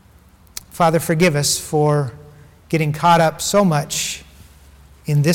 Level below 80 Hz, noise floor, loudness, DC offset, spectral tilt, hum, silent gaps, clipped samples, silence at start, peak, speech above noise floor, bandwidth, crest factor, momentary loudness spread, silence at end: -48 dBFS; -49 dBFS; -17 LUFS; under 0.1%; -4.5 dB/octave; none; none; under 0.1%; 0.75 s; -4 dBFS; 32 dB; 18 kHz; 14 dB; 17 LU; 0 s